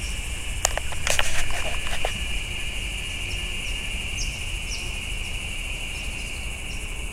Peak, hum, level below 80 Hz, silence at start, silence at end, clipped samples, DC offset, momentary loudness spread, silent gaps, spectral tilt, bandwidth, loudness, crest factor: 0 dBFS; none; -32 dBFS; 0 s; 0 s; under 0.1%; under 0.1%; 7 LU; none; -2 dB/octave; 16 kHz; -28 LUFS; 26 dB